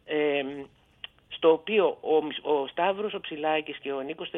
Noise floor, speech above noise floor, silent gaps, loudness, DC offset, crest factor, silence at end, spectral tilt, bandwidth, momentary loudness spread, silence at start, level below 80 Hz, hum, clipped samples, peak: -48 dBFS; 22 dB; none; -27 LUFS; under 0.1%; 18 dB; 0 s; -7 dB/octave; 3.9 kHz; 17 LU; 0.05 s; -70 dBFS; none; under 0.1%; -10 dBFS